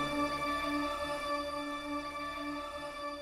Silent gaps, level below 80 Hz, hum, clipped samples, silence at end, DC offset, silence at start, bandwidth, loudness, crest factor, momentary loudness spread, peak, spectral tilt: none; -56 dBFS; none; under 0.1%; 0 s; under 0.1%; 0 s; 16.5 kHz; -36 LUFS; 14 dB; 7 LU; -24 dBFS; -4 dB/octave